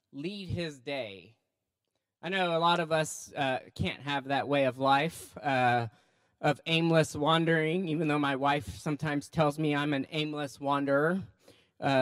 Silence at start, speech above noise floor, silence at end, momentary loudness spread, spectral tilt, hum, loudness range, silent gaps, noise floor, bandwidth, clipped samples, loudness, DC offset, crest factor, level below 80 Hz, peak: 0.15 s; 56 dB; 0 s; 10 LU; -5.5 dB/octave; none; 4 LU; none; -85 dBFS; 15.5 kHz; under 0.1%; -30 LUFS; under 0.1%; 20 dB; -62 dBFS; -12 dBFS